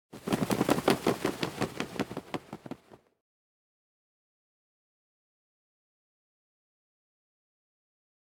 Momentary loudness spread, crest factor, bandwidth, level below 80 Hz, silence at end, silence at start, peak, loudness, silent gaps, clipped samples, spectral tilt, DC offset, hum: 18 LU; 28 dB; 19.5 kHz; -64 dBFS; 5.5 s; 0.15 s; -8 dBFS; -31 LUFS; none; under 0.1%; -5 dB/octave; under 0.1%; none